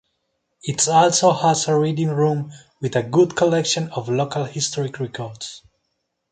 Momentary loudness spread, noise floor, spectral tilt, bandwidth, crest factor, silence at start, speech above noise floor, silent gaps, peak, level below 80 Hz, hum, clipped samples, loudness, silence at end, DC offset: 15 LU; -74 dBFS; -4.5 dB/octave; 9.6 kHz; 18 dB; 0.65 s; 55 dB; none; -4 dBFS; -60 dBFS; none; under 0.1%; -19 LUFS; 0.75 s; under 0.1%